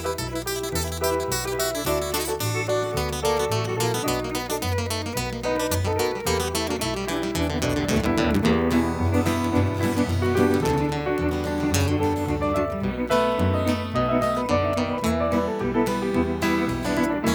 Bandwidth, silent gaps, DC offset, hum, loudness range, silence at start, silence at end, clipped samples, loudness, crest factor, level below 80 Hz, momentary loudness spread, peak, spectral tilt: 19.5 kHz; none; under 0.1%; none; 3 LU; 0 s; 0 s; under 0.1%; -24 LUFS; 18 dB; -40 dBFS; 5 LU; -6 dBFS; -5 dB/octave